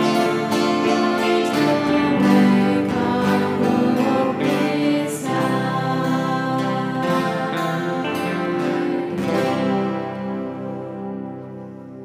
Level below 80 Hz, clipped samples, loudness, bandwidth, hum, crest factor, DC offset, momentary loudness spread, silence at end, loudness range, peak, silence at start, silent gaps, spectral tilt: -58 dBFS; under 0.1%; -20 LUFS; 15.5 kHz; none; 16 dB; under 0.1%; 11 LU; 0 s; 5 LU; -4 dBFS; 0 s; none; -6 dB/octave